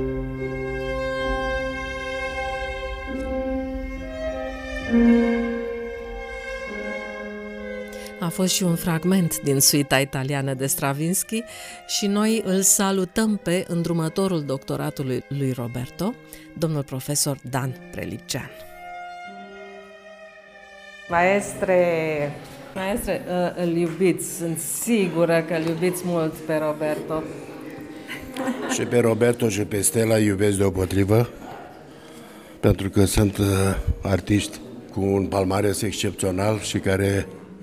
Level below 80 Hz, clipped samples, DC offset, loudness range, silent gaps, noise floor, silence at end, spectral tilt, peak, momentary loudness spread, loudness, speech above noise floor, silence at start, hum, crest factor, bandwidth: -42 dBFS; under 0.1%; under 0.1%; 7 LU; none; -45 dBFS; 0 s; -4.5 dB/octave; -4 dBFS; 17 LU; -23 LUFS; 23 dB; 0 s; none; 20 dB; 16 kHz